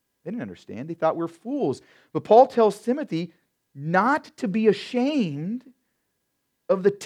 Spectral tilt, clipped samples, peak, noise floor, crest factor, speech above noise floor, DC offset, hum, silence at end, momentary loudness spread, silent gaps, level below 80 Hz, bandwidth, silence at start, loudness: -6.5 dB/octave; under 0.1%; -4 dBFS; -76 dBFS; 20 dB; 53 dB; under 0.1%; none; 0 s; 18 LU; none; -76 dBFS; 12 kHz; 0.25 s; -23 LUFS